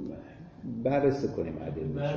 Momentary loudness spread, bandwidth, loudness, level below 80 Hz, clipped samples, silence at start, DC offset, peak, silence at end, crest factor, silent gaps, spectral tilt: 18 LU; 7 kHz; -31 LUFS; -54 dBFS; under 0.1%; 0 s; under 0.1%; -14 dBFS; 0 s; 18 dB; none; -8.5 dB/octave